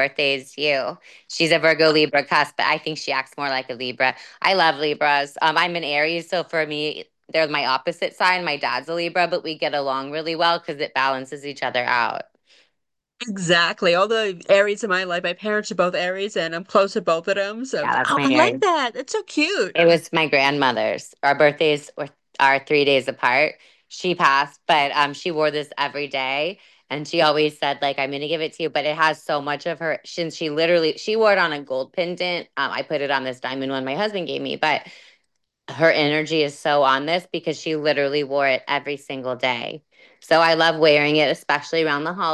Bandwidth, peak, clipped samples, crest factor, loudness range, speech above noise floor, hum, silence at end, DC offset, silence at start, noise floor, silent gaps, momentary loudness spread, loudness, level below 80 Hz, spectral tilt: 12.5 kHz; -2 dBFS; under 0.1%; 20 dB; 4 LU; 57 dB; none; 0 s; under 0.1%; 0 s; -78 dBFS; none; 9 LU; -20 LUFS; -74 dBFS; -4 dB/octave